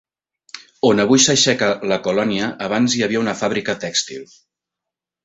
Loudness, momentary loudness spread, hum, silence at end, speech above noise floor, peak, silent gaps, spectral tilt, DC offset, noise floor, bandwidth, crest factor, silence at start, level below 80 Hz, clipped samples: -17 LUFS; 17 LU; none; 1 s; 67 dB; 0 dBFS; none; -3 dB/octave; under 0.1%; -85 dBFS; 8.2 kHz; 18 dB; 0.55 s; -58 dBFS; under 0.1%